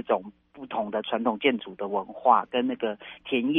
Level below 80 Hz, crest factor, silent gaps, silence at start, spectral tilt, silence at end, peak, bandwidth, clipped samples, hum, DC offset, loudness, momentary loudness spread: -70 dBFS; 22 dB; none; 0.05 s; -7.5 dB/octave; 0 s; -6 dBFS; 3.9 kHz; under 0.1%; none; under 0.1%; -27 LUFS; 12 LU